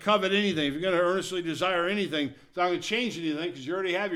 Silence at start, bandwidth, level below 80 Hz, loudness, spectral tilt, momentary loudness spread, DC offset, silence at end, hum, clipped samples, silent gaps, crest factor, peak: 0 s; 14.5 kHz; -64 dBFS; -28 LUFS; -4.5 dB/octave; 7 LU; under 0.1%; 0 s; none; under 0.1%; none; 16 dB; -12 dBFS